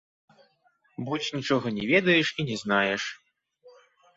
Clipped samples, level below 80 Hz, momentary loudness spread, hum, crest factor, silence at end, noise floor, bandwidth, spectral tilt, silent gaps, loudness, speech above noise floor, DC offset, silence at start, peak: under 0.1%; -66 dBFS; 13 LU; none; 20 dB; 0.45 s; -67 dBFS; 8 kHz; -5 dB/octave; none; -25 LUFS; 41 dB; under 0.1%; 1 s; -8 dBFS